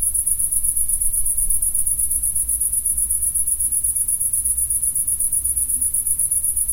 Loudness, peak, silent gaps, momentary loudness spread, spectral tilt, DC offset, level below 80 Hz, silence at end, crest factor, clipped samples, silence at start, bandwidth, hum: -17 LUFS; -4 dBFS; none; 1 LU; -1 dB/octave; under 0.1%; -34 dBFS; 0 s; 16 dB; under 0.1%; 0 s; 17 kHz; none